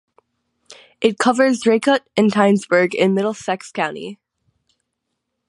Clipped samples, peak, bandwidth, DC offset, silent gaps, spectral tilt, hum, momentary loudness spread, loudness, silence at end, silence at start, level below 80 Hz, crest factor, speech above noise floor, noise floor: under 0.1%; -2 dBFS; 11.5 kHz; under 0.1%; none; -5 dB/octave; none; 9 LU; -17 LUFS; 1.35 s; 0.7 s; -68 dBFS; 18 dB; 59 dB; -76 dBFS